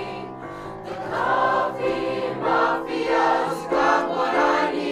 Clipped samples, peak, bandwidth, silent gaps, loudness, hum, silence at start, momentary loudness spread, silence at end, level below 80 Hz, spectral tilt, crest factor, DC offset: under 0.1%; -6 dBFS; 14.5 kHz; none; -22 LUFS; none; 0 s; 14 LU; 0 s; -54 dBFS; -5 dB/octave; 16 dB; under 0.1%